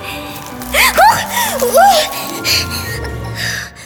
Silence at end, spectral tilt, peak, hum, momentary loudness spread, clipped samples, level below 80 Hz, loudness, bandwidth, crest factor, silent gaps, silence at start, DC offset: 0 s; -2 dB/octave; 0 dBFS; none; 15 LU; under 0.1%; -34 dBFS; -12 LUFS; over 20 kHz; 14 dB; none; 0 s; under 0.1%